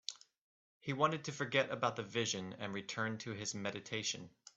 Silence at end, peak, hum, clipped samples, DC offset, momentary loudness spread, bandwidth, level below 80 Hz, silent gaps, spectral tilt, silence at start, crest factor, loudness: 0.3 s; -16 dBFS; none; under 0.1%; under 0.1%; 9 LU; 8.2 kHz; -78 dBFS; 0.38-0.80 s; -3.5 dB/octave; 0.1 s; 24 dB; -39 LUFS